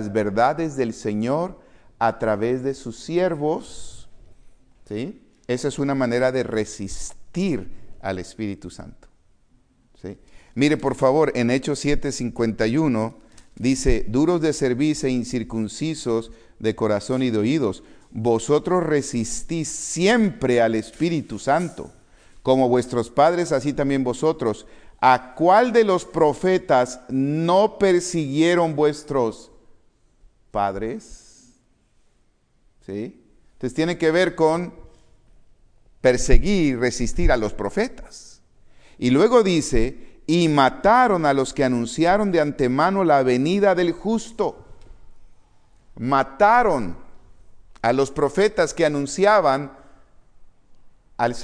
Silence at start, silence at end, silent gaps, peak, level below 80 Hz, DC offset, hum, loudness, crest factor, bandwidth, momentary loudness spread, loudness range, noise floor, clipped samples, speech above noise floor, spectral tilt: 0 s; 0 s; none; 0 dBFS; -34 dBFS; under 0.1%; none; -21 LUFS; 22 dB; 10.5 kHz; 14 LU; 8 LU; -61 dBFS; under 0.1%; 41 dB; -5.5 dB/octave